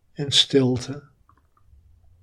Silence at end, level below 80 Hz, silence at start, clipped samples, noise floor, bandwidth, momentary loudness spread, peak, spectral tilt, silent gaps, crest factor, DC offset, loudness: 1.2 s; -58 dBFS; 0.2 s; under 0.1%; -59 dBFS; 12.5 kHz; 19 LU; -2 dBFS; -4 dB/octave; none; 22 dB; under 0.1%; -20 LUFS